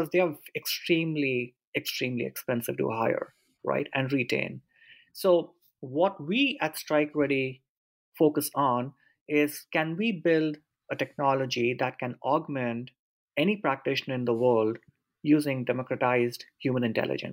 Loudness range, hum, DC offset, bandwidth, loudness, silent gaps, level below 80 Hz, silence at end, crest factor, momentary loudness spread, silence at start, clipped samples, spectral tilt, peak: 2 LU; none; under 0.1%; 16 kHz; -28 LUFS; 1.67-1.73 s, 7.69-8.12 s, 9.21-9.26 s, 12.99-13.28 s; -76 dBFS; 0 s; 18 dB; 10 LU; 0 s; under 0.1%; -5.5 dB/octave; -12 dBFS